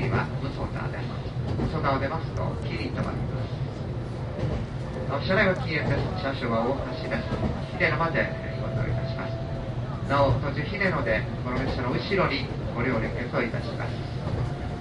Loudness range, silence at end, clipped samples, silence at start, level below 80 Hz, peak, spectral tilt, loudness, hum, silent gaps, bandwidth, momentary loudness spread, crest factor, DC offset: 3 LU; 0 s; under 0.1%; 0 s; -38 dBFS; -8 dBFS; -7.5 dB/octave; -28 LUFS; none; none; 9.8 kHz; 8 LU; 20 dB; under 0.1%